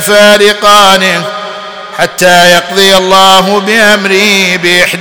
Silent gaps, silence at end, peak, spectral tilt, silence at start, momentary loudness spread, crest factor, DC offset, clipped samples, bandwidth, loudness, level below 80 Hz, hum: none; 0 s; 0 dBFS; -2.5 dB/octave; 0 s; 12 LU; 6 dB; 2%; 6%; over 20 kHz; -4 LUFS; -42 dBFS; none